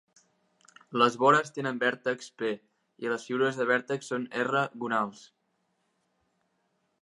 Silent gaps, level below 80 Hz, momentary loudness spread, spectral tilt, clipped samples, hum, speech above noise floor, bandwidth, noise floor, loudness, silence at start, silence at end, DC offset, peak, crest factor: none; -84 dBFS; 11 LU; -4.5 dB/octave; under 0.1%; none; 48 dB; 11.5 kHz; -76 dBFS; -28 LUFS; 0.9 s; 1.75 s; under 0.1%; -8 dBFS; 22 dB